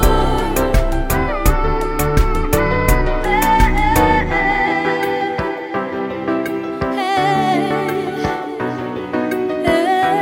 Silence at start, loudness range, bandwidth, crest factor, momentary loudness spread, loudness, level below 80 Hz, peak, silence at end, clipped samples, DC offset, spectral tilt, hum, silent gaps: 0 s; 4 LU; 17 kHz; 16 dB; 8 LU; -17 LUFS; -22 dBFS; 0 dBFS; 0 s; under 0.1%; under 0.1%; -5.5 dB/octave; none; none